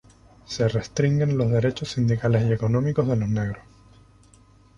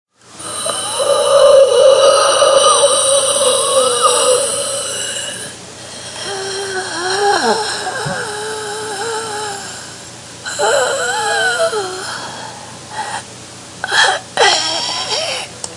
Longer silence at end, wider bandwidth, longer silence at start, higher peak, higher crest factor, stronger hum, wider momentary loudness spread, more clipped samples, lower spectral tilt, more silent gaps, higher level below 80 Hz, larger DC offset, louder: first, 1.2 s vs 0 s; second, 8.2 kHz vs 11.5 kHz; first, 0.5 s vs 0.3 s; second, -8 dBFS vs 0 dBFS; about the same, 16 dB vs 16 dB; neither; second, 6 LU vs 19 LU; neither; first, -7 dB/octave vs -0.5 dB/octave; neither; first, -48 dBFS vs -58 dBFS; neither; second, -23 LUFS vs -13 LUFS